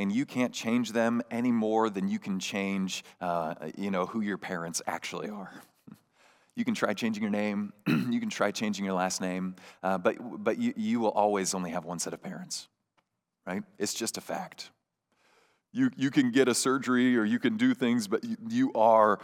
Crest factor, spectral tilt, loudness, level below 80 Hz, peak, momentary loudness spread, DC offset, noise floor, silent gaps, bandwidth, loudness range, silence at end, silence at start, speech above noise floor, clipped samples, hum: 20 dB; -4.5 dB/octave; -30 LUFS; -84 dBFS; -10 dBFS; 13 LU; under 0.1%; -76 dBFS; none; 16.5 kHz; 8 LU; 0 s; 0 s; 47 dB; under 0.1%; none